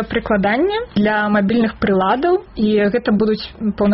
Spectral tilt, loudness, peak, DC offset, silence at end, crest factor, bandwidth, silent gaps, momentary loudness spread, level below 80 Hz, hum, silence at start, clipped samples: -5 dB/octave; -17 LUFS; -4 dBFS; under 0.1%; 0 s; 12 dB; 5.8 kHz; none; 3 LU; -40 dBFS; none; 0 s; under 0.1%